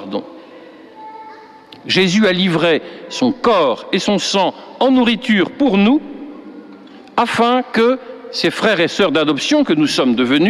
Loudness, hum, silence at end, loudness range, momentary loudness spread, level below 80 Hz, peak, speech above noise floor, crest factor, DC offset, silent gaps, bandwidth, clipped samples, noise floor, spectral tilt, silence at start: -15 LUFS; none; 0 s; 2 LU; 19 LU; -54 dBFS; -2 dBFS; 25 dB; 14 dB; under 0.1%; none; 13 kHz; under 0.1%; -39 dBFS; -5 dB/octave; 0 s